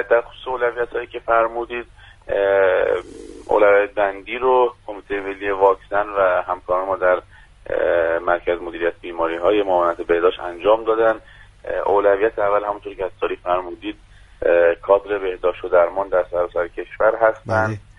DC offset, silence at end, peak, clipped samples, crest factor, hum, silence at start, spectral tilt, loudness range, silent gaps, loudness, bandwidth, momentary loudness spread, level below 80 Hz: under 0.1%; 0.2 s; -2 dBFS; under 0.1%; 18 dB; none; 0 s; -6.5 dB/octave; 2 LU; none; -19 LUFS; 9.4 kHz; 11 LU; -48 dBFS